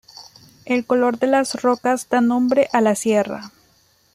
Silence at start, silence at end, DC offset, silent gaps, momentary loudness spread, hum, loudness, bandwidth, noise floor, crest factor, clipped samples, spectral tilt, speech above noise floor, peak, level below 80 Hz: 0.2 s; 0.65 s; under 0.1%; none; 6 LU; none; -19 LUFS; 15.5 kHz; -58 dBFS; 16 dB; under 0.1%; -4.5 dB/octave; 40 dB; -2 dBFS; -64 dBFS